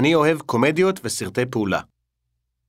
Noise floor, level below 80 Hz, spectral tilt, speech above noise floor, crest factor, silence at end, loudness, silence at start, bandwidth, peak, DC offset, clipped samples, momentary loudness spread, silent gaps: -76 dBFS; -58 dBFS; -5 dB/octave; 56 dB; 18 dB; 0.85 s; -21 LUFS; 0 s; 16 kHz; -4 dBFS; under 0.1%; under 0.1%; 8 LU; none